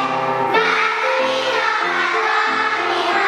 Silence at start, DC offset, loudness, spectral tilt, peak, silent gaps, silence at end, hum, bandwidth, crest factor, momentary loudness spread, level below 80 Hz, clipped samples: 0 s; under 0.1%; -17 LUFS; -3 dB/octave; -4 dBFS; none; 0 s; none; 16 kHz; 14 dB; 2 LU; -70 dBFS; under 0.1%